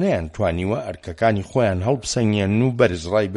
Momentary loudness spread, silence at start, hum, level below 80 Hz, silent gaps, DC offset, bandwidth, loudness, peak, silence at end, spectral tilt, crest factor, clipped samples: 6 LU; 0 s; none; -42 dBFS; none; under 0.1%; 11.5 kHz; -21 LUFS; -4 dBFS; 0 s; -6 dB/octave; 16 dB; under 0.1%